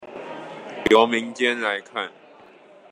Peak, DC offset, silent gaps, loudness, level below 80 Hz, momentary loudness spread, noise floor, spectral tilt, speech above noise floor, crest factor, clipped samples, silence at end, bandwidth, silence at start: -2 dBFS; under 0.1%; none; -21 LUFS; -58 dBFS; 19 LU; -49 dBFS; -3.5 dB/octave; 28 dB; 22 dB; under 0.1%; 0.85 s; 11.5 kHz; 0 s